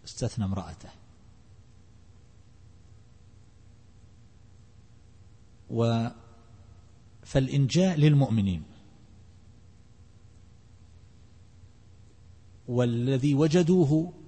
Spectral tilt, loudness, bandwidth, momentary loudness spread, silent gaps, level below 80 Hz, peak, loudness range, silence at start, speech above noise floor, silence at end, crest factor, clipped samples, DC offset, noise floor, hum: -7 dB/octave; -26 LUFS; 8.8 kHz; 14 LU; none; -54 dBFS; -10 dBFS; 12 LU; 0.05 s; 31 dB; 0.15 s; 20 dB; under 0.1%; 0.1%; -55 dBFS; 60 Hz at -60 dBFS